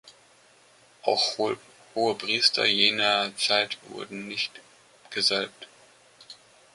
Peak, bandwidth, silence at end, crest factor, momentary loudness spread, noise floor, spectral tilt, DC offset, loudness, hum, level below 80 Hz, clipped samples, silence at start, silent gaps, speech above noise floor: -4 dBFS; 11.5 kHz; 0.4 s; 24 dB; 16 LU; -58 dBFS; -1.5 dB/octave; under 0.1%; -24 LUFS; none; -74 dBFS; under 0.1%; 0.05 s; none; 32 dB